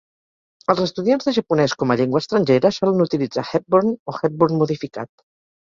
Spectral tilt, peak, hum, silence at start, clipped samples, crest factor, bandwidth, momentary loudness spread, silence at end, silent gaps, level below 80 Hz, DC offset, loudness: -6.5 dB/octave; -2 dBFS; none; 0.7 s; under 0.1%; 18 dB; 7.6 kHz; 8 LU; 0.55 s; 4.00-4.06 s; -60 dBFS; under 0.1%; -19 LUFS